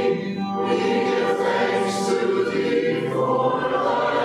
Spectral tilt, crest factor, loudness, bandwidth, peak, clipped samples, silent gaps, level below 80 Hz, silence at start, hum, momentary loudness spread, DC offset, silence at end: -5.5 dB/octave; 12 dB; -22 LUFS; 13 kHz; -8 dBFS; under 0.1%; none; -62 dBFS; 0 s; none; 2 LU; under 0.1%; 0 s